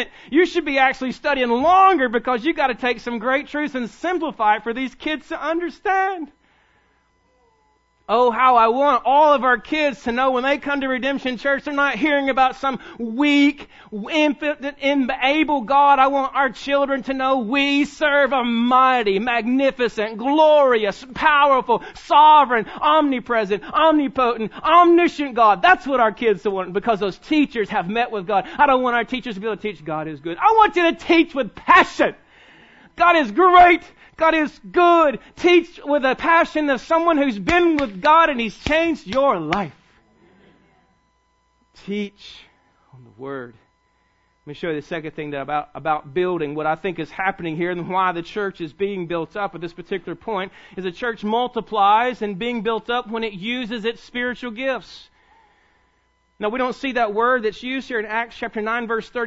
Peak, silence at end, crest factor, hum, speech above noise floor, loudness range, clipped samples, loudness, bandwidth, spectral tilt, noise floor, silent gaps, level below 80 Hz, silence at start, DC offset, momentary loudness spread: 0 dBFS; 0 s; 18 dB; none; 45 dB; 11 LU; under 0.1%; -19 LUFS; 8 kHz; -5 dB/octave; -64 dBFS; none; -50 dBFS; 0 s; under 0.1%; 13 LU